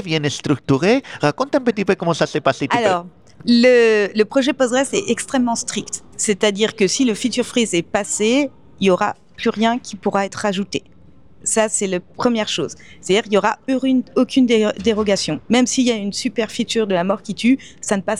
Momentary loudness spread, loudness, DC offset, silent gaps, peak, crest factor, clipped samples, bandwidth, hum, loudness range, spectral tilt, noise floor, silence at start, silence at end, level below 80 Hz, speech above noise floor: 7 LU; -18 LUFS; 0.4%; none; -2 dBFS; 16 dB; under 0.1%; 12.5 kHz; none; 4 LU; -4 dB/octave; -49 dBFS; 0 s; 0 s; -56 dBFS; 31 dB